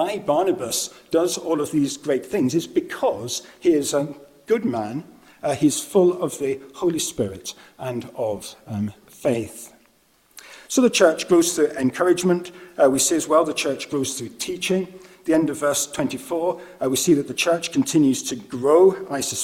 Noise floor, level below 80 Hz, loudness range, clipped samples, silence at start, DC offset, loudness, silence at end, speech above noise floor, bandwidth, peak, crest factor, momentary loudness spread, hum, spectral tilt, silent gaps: -60 dBFS; -60 dBFS; 7 LU; under 0.1%; 0 s; under 0.1%; -21 LUFS; 0 s; 38 dB; 17 kHz; -2 dBFS; 20 dB; 12 LU; none; -4 dB/octave; none